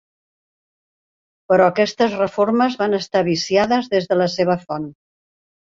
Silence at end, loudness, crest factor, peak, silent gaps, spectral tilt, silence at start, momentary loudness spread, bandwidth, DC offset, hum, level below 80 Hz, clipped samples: 0.85 s; -18 LUFS; 18 dB; -2 dBFS; none; -5.5 dB/octave; 1.5 s; 6 LU; 7.6 kHz; under 0.1%; none; -60 dBFS; under 0.1%